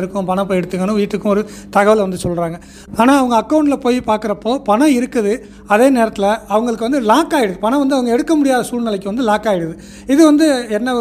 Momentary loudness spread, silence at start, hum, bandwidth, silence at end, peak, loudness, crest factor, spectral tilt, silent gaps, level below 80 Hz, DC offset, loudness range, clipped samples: 8 LU; 0 s; 50 Hz at -40 dBFS; 15.5 kHz; 0 s; 0 dBFS; -15 LUFS; 14 dB; -5.5 dB/octave; none; -44 dBFS; under 0.1%; 1 LU; under 0.1%